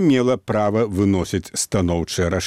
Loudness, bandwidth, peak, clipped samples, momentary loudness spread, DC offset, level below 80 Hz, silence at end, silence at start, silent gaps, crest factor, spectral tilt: -20 LUFS; 15.5 kHz; -6 dBFS; under 0.1%; 3 LU; under 0.1%; -42 dBFS; 0 s; 0 s; none; 14 dB; -5.5 dB/octave